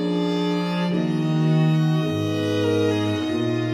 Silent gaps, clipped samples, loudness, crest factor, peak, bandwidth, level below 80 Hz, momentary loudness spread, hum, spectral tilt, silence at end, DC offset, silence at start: none; under 0.1%; -22 LUFS; 12 dB; -10 dBFS; 12.5 kHz; -66 dBFS; 4 LU; none; -7.5 dB/octave; 0 s; under 0.1%; 0 s